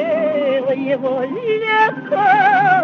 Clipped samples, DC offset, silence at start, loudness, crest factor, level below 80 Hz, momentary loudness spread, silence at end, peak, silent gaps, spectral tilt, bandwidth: under 0.1%; under 0.1%; 0 s; -16 LUFS; 12 dB; -70 dBFS; 8 LU; 0 s; -2 dBFS; none; -6.5 dB/octave; 6.6 kHz